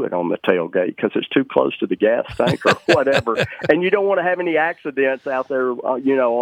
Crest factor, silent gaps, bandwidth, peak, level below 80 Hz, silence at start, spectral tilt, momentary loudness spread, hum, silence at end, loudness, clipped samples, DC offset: 18 dB; none; 13 kHz; 0 dBFS; -56 dBFS; 0 s; -6 dB/octave; 5 LU; none; 0 s; -19 LUFS; under 0.1%; under 0.1%